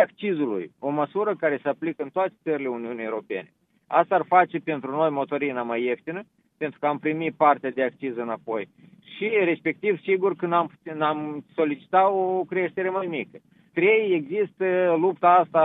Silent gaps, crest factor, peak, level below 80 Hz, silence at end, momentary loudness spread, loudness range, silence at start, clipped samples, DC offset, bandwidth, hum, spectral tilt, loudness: none; 18 dB; -6 dBFS; -80 dBFS; 0 s; 11 LU; 3 LU; 0 s; under 0.1%; under 0.1%; 4 kHz; none; -9 dB/octave; -24 LUFS